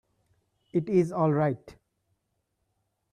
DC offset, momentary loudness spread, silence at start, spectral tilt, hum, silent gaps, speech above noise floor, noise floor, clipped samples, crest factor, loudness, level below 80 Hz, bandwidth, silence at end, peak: under 0.1%; 7 LU; 0.75 s; -9.5 dB/octave; none; none; 52 dB; -78 dBFS; under 0.1%; 18 dB; -27 LUFS; -66 dBFS; 10 kHz; 1.4 s; -12 dBFS